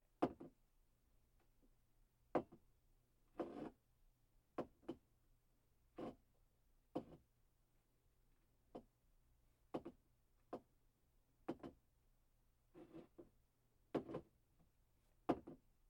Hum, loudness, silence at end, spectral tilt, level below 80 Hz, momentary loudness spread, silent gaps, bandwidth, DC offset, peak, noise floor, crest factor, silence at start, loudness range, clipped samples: none; -52 LUFS; 0.3 s; -7.5 dB/octave; -76 dBFS; 17 LU; none; 16.5 kHz; under 0.1%; -24 dBFS; -80 dBFS; 32 dB; 0.2 s; 9 LU; under 0.1%